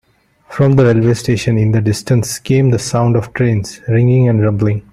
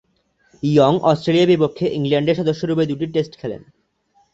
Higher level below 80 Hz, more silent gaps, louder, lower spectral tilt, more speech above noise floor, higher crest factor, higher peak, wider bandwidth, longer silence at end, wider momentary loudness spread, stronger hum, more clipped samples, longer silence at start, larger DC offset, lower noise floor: first, -42 dBFS vs -56 dBFS; neither; first, -13 LUFS vs -18 LUFS; about the same, -7 dB/octave vs -7.5 dB/octave; second, 33 dB vs 45 dB; second, 12 dB vs 18 dB; about the same, -2 dBFS vs -2 dBFS; first, 13.5 kHz vs 8 kHz; second, 0.15 s vs 0.75 s; second, 5 LU vs 12 LU; neither; neither; second, 0.5 s vs 0.65 s; neither; second, -45 dBFS vs -62 dBFS